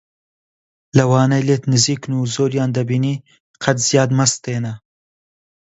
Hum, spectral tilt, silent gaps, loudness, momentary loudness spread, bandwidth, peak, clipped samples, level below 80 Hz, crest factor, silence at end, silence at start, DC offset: none; -5 dB/octave; 3.40-3.54 s; -17 LUFS; 10 LU; 8.2 kHz; 0 dBFS; under 0.1%; -56 dBFS; 18 dB; 0.95 s; 0.95 s; under 0.1%